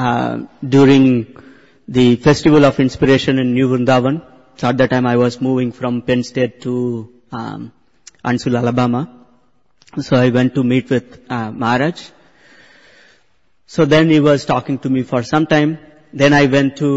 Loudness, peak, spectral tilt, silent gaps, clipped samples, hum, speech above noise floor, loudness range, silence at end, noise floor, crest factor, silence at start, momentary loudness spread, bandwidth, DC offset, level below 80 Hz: -15 LUFS; -2 dBFS; -7 dB/octave; none; under 0.1%; none; 48 dB; 7 LU; 0 s; -62 dBFS; 14 dB; 0 s; 16 LU; 8 kHz; 0.2%; -46 dBFS